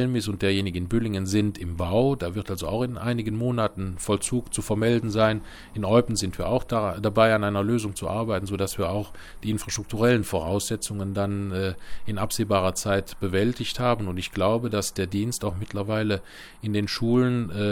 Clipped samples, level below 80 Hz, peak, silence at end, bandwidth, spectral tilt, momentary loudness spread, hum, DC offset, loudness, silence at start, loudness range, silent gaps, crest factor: under 0.1%; -44 dBFS; -4 dBFS; 0 s; 17.5 kHz; -5.5 dB/octave; 8 LU; none; under 0.1%; -26 LUFS; 0 s; 3 LU; none; 20 dB